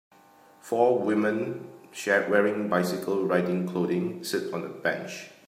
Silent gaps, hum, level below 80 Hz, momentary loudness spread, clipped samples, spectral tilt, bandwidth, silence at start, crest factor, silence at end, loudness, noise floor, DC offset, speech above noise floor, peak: none; none; -76 dBFS; 11 LU; under 0.1%; -5.5 dB/octave; 16 kHz; 0.65 s; 20 dB; 0.2 s; -27 LUFS; -56 dBFS; under 0.1%; 29 dB; -8 dBFS